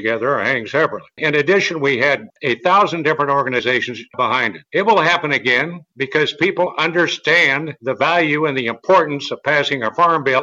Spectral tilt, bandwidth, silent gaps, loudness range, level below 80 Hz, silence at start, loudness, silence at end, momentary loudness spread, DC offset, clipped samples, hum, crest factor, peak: -4.5 dB/octave; 8 kHz; none; 1 LU; -64 dBFS; 0 s; -16 LUFS; 0 s; 7 LU; under 0.1%; under 0.1%; none; 14 dB; -2 dBFS